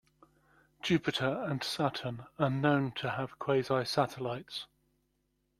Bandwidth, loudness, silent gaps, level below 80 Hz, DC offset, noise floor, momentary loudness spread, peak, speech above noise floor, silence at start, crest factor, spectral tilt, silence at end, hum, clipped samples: 14.5 kHz; -33 LUFS; none; -66 dBFS; under 0.1%; -78 dBFS; 10 LU; -14 dBFS; 45 dB; 0.85 s; 20 dB; -6 dB/octave; 0.95 s; none; under 0.1%